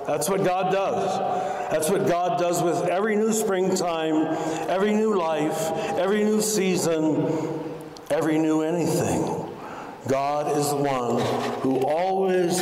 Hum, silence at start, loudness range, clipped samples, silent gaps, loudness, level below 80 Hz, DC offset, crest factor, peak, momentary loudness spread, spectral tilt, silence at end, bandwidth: none; 0 s; 2 LU; under 0.1%; none; -24 LUFS; -60 dBFS; under 0.1%; 10 dB; -14 dBFS; 5 LU; -5 dB/octave; 0 s; 16 kHz